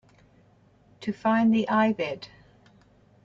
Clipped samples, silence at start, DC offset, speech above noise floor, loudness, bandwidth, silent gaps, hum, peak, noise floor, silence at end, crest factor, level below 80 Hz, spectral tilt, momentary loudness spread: under 0.1%; 1 s; under 0.1%; 35 dB; -25 LUFS; 7.2 kHz; none; none; -10 dBFS; -59 dBFS; 1 s; 18 dB; -66 dBFS; -7 dB/octave; 16 LU